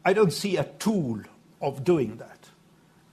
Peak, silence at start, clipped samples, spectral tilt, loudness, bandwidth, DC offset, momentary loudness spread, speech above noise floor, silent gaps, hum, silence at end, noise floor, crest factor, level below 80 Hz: -8 dBFS; 0.05 s; under 0.1%; -6 dB/octave; -27 LUFS; 14 kHz; under 0.1%; 14 LU; 33 dB; none; none; 0.8 s; -58 dBFS; 20 dB; -62 dBFS